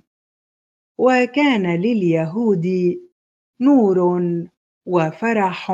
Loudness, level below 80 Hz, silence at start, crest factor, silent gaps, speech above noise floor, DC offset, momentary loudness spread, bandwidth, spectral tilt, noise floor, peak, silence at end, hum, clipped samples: -18 LUFS; -66 dBFS; 1 s; 16 dB; 3.12-3.53 s, 4.57-4.81 s; over 73 dB; under 0.1%; 11 LU; 7.8 kHz; -7.5 dB/octave; under -90 dBFS; -2 dBFS; 0 s; none; under 0.1%